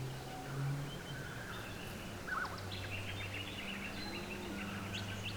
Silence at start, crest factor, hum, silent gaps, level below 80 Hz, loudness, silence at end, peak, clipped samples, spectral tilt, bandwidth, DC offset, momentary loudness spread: 0 s; 14 dB; none; none; -58 dBFS; -43 LUFS; 0 s; -28 dBFS; under 0.1%; -4.5 dB/octave; over 20 kHz; under 0.1%; 5 LU